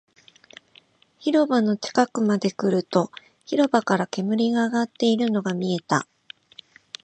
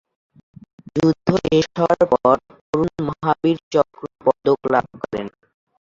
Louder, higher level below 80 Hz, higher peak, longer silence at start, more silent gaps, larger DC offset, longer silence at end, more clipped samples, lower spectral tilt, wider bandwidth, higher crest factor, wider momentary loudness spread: second, -23 LUFS vs -20 LUFS; second, -74 dBFS vs -52 dBFS; about the same, -4 dBFS vs -2 dBFS; first, 1.2 s vs 0.95 s; second, none vs 2.61-2.73 s, 3.63-3.71 s; neither; first, 1 s vs 0.55 s; neither; second, -5.5 dB/octave vs -7 dB/octave; first, 8.8 kHz vs 7.6 kHz; about the same, 20 dB vs 18 dB; about the same, 10 LU vs 11 LU